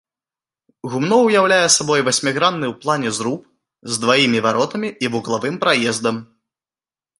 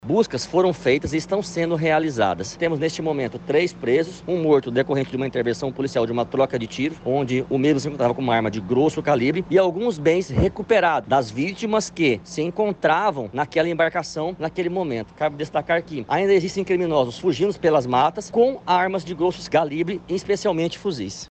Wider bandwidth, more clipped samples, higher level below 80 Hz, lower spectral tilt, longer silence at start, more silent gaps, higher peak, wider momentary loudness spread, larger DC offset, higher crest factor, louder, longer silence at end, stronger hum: first, 11.5 kHz vs 8.8 kHz; neither; second, -64 dBFS vs -48 dBFS; second, -3 dB/octave vs -5.5 dB/octave; first, 0.85 s vs 0.05 s; neither; first, 0 dBFS vs -6 dBFS; first, 11 LU vs 7 LU; neither; about the same, 18 dB vs 14 dB; first, -17 LUFS vs -22 LUFS; first, 0.95 s vs 0.05 s; neither